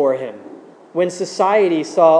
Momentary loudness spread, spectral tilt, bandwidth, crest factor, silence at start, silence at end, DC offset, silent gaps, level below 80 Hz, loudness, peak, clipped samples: 14 LU; -5 dB/octave; 10.5 kHz; 16 dB; 0 s; 0 s; under 0.1%; none; -88 dBFS; -18 LUFS; 0 dBFS; under 0.1%